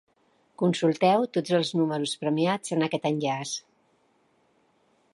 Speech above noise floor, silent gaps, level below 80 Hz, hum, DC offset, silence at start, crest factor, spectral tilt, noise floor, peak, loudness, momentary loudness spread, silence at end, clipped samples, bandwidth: 42 dB; none; -76 dBFS; none; under 0.1%; 0.6 s; 20 dB; -5 dB/octave; -67 dBFS; -8 dBFS; -26 LUFS; 6 LU; 1.55 s; under 0.1%; 11.5 kHz